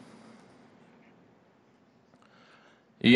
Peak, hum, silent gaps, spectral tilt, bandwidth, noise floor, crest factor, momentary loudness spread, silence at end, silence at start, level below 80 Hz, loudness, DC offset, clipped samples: -8 dBFS; none; none; -6.5 dB/octave; 10.5 kHz; -63 dBFS; 24 dB; 8 LU; 0 s; 3.05 s; -72 dBFS; -28 LUFS; under 0.1%; under 0.1%